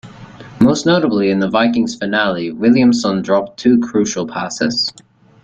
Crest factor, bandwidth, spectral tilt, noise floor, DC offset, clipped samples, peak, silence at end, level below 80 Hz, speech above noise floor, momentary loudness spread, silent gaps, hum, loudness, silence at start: 14 dB; 8.2 kHz; -5 dB/octave; -36 dBFS; under 0.1%; under 0.1%; 0 dBFS; 0.55 s; -50 dBFS; 21 dB; 7 LU; none; none; -15 LUFS; 0.05 s